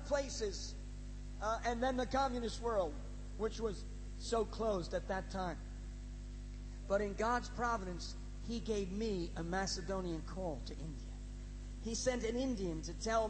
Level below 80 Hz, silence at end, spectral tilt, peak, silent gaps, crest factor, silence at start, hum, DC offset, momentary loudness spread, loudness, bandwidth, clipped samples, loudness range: -46 dBFS; 0 s; -4.5 dB/octave; -22 dBFS; none; 18 dB; 0 s; 50 Hz at -45 dBFS; under 0.1%; 13 LU; -40 LUFS; 8.4 kHz; under 0.1%; 3 LU